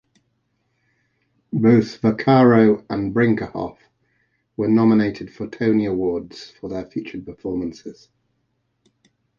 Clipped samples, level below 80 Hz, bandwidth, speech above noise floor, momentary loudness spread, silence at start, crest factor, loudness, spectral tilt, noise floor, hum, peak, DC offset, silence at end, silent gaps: under 0.1%; -54 dBFS; 7 kHz; 52 dB; 18 LU; 1.55 s; 18 dB; -19 LUFS; -8.5 dB/octave; -70 dBFS; none; -2 dBFS; under 0.1%; 1.45 s; none